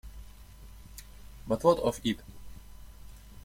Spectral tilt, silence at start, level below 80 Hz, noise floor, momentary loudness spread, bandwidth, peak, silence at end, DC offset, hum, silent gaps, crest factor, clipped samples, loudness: -5.5 dB/octave; 0.05 s; -50 dBFS; -49 dBFS; 27 LU; 16.5 kHz; -10 dBFS; 0.05 s; under 0.1%; none; none; 24 dB; under 0.1%; -29 LUFS